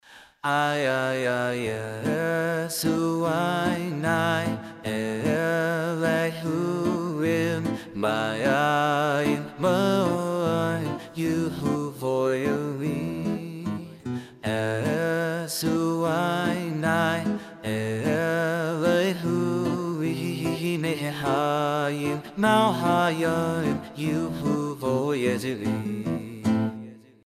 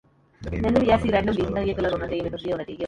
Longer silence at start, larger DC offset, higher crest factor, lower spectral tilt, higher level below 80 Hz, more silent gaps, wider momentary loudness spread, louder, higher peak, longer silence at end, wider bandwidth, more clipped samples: second, 0.1 s vs 0.4 s; neither; about the same, 18 dB vs 18 dB; second, -5.5 dB/octave vs -7.5 dB/octave; second, -62 dBFS vs -38 dBFS; neither; second, 7 LU vs 10 LU; about the same, -26 LUFS vs -24 LUFS; about the same, -8 dBFS vs -6 dBFS; first, 0.25 s vs 0 s; first, 15.5 kHz vs 11 kHz; neither